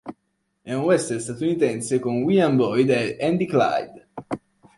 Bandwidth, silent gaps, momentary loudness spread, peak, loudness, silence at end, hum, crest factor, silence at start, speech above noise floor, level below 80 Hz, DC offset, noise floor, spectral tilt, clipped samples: 11.5 kHz; none; 15 LU; -6 dBFS; -22 LUFS; 0.4 s; none; 16 dB; 0.05 s; 52 dB; -62 dBFS; under 0.1%; -73 dBFS; -6 dB/octave; under 0.1%